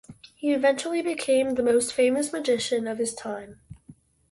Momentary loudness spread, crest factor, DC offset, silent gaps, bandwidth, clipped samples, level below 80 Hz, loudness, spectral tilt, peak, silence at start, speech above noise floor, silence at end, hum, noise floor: 11 LU; 16 dB; under 0.1%; none; 11.5 kHz; under 0.1%; -62 dBFS; -25 LUFS; -3 dB/octave; -10 dBFS; 0.1 s; 29 dB; 0.4 s; none; -53 dBFS